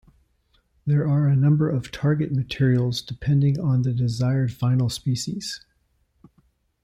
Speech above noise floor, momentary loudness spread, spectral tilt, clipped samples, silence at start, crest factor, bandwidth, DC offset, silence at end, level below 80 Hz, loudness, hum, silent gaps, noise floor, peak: 46 dB; 8 LU; -7 dB/octave; under 0.1%; 0.85 s; 14 dB; 12 kHz; under 0.1%; 1.25 s; -52 dBFS; -23 LUFS; none; none; -67 dBFS; -10 dBFS